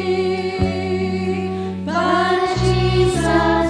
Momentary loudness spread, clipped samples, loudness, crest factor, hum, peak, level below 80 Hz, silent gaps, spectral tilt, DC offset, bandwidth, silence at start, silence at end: 6 LU; under 0.1%; -19 LUFS; 14 dB; none; -4 dBFS; -32 dBFS; none; -6 dB/octave; under 0.1%; 10.5 kHz; 0 s; 0 s